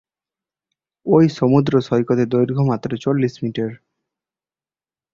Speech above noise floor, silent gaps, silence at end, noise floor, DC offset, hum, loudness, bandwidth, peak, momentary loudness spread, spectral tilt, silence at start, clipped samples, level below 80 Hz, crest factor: over 73 dB; none; 1.4 s; under -90 dBFS; under 0.1%; none; -18 LUFS; 7.4 kHz; -2 dBFS; 10 LU; -8.5 dB/octave; 1.05 s; under 0.1%; -56 dBFS; 18 dB